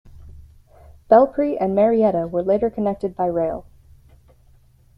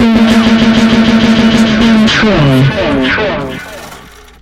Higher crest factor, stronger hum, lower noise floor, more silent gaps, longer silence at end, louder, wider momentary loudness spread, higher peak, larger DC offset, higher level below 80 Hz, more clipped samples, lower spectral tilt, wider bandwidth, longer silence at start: first, 20 dB vs 8 dB; neither; first, -53 dBFS vs -33 dBFS; neither; first, 1.35 s vs 0.4 s; second, -19 LUFS vs -8 LUFS; second, 9 LU vs 12 LU; about the same, -2 dBFS vs -2 dBFS; neither; second, -48 dBFS vs -28 dBFS; neither; first, -10 dB/octave vs -6 dB/octave; second, 5.4 kHz vs 11.5 kHz; first, 0.15 s vs 0 s